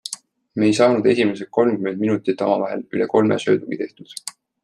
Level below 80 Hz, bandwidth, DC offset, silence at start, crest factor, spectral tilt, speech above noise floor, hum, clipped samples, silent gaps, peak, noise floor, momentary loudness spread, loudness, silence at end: -64 dBFS; 13 kHz; under 0.1%; 0.05 s; 18 dB; -5.5 dB/octave; 19 dB; none; under 0.1%; none; -2 dBFS; -38 dBFS; 17 LU; -19 LUFS; 0.35 s